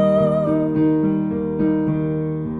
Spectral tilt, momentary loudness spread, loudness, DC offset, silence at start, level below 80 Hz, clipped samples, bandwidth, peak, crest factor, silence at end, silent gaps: -10.5 dB/octave; 5 LU; -19 LUFS; under 0.1%; 0 s; -46 dBFS; under 0.1%; 4 kHz; -6 dBFS; 12 dB; 0 s; none